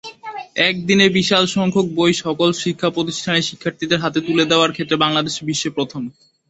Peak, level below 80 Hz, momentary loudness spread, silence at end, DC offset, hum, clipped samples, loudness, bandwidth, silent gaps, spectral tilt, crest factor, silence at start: 0 dBFS; -56 dBFS; 11 LU; 0.4 s; under 0.1%; none; under 0.1%; -17 LUFS; 8.2 kHz; none; -4 dB/octave; 18 dB; 0.05 s